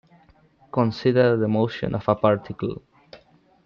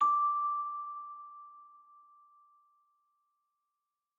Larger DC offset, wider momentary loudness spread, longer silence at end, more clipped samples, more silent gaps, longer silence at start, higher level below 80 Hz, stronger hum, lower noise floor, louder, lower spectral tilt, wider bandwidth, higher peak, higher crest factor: neither; second, 11 LU vs 24 LU; second, 0.5 s vs 2.5 s; neither; neither; first, 0.75 s vs 0 s; first, -56 dBFS vs under -90 dBFS; neither; second, -56 dBFS vs -88 dBFS; first, -22 LUFS vs -33 LUFS; first, -8.5 dB/octave vs -1 dB/octave; about the same, 6.8 kHz vs 7 kHz; first, -4 dBFS vs -18 dBFS; about the same, 20 dB vs 18 dB